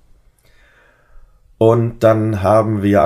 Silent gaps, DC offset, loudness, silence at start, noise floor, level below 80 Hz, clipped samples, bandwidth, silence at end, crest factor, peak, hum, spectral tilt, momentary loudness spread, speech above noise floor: none; under 0.1%; -14 LUFS; 1.6 s; -51 dBFS; -46 dBFS; under 0.1%; 14.5 kHz; 0 s; 16 dB; 0 dBFS; none; -8.5 dB/octave; 2 LU; 38 dB